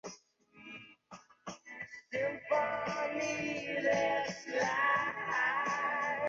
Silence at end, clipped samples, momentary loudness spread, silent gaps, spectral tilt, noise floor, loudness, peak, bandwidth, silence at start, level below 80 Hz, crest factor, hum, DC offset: 0 s; under 0.1%; 19 LU; none; -2 dB/octave; -61 dBFS; -33 LUFS; -18 dBFS; 7.6 kHz; 0.05 s; -74 dBFS; 16 dB; none; under 0.1%